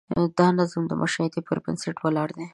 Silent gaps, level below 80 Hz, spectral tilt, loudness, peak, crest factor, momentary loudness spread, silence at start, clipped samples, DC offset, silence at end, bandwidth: none; -58 dBFS; -6 dB/octave; -25 LUFS; -6 dBFS; 18 dB; 8 LU; 0.1 s; under 0.1%; under 0.1%; 0.05 s; 11 kHz